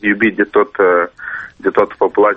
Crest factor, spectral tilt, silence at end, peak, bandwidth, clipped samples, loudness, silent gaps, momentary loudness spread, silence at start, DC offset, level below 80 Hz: 14 dB; -8 dB/octave; 0 s; 0 dBFS; 4.6 kHz; under 0.1%; -14 LUFS; none; 9 LU; 0.05 s; under 0.1%; -52 dBFS